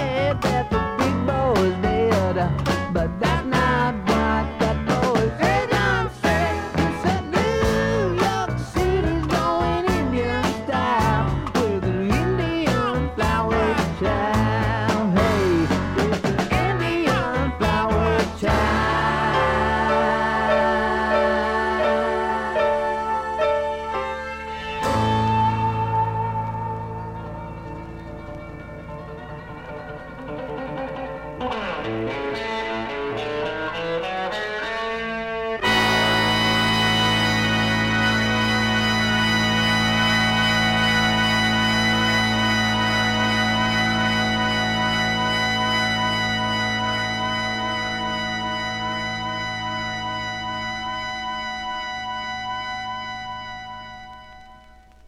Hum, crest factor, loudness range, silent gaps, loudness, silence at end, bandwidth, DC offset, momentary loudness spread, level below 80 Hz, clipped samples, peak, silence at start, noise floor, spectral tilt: none; 14 dB; 10 LU; none; -21 LUFS; 0 s; 16.5 kHz; under 0.1%; 12 LU; -36 dBFS; under 0.1%; -8 dBFS; 0 s; -48 dBFS; -5 dB/octave